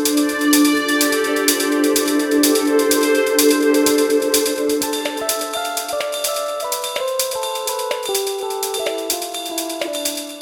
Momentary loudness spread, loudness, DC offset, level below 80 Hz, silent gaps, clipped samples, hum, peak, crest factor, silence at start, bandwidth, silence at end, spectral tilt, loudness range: 8 LU; -18 LUFS; under 0.1%; -58 dBFS; none; under 0.1%; none; 0 dBFS; 18 dB; 0 s; 19.5 kHz; 0 s; -1 dB/octave; 6 LU